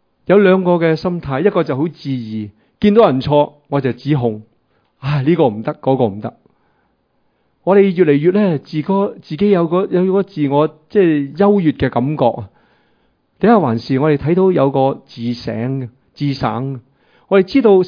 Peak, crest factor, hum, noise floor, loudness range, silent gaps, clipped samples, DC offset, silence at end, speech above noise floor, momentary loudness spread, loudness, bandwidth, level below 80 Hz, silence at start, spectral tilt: 0 dBFS; 14 dB; none; -62 dBFS; 4 LU; none; under 0.1%; under 0.1%; 0 s; 48 dB; 12 LU; -15 LUFS; 5.2 kHz; -48 dBFS; 0.3 s; -9.5 dB/octave